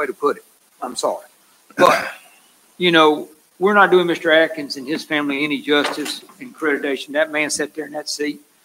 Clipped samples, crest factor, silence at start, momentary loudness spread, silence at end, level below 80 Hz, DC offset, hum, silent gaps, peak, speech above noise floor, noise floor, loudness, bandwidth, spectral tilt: under 0.1%; 20 dB; 0 s; 15 LU; 0.25 s; -68 dBFS; under 0.1%; none; none; 0 dBFS; 34 dB; -52 dBFS; -18 LUFS; 16 kHz; -3.5 dB/octave